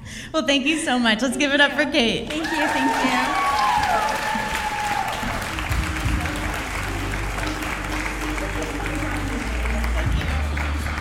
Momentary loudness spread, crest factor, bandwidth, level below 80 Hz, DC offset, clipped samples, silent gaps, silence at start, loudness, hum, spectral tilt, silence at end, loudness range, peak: 7 LU; 18 dB; 17 kHz; -30 dBFS; under 0.1%; under 0.1%; none; 0 s; -22 LUFS; none; -4 dB/octave; 0 s; 6 LU; -4 dBFS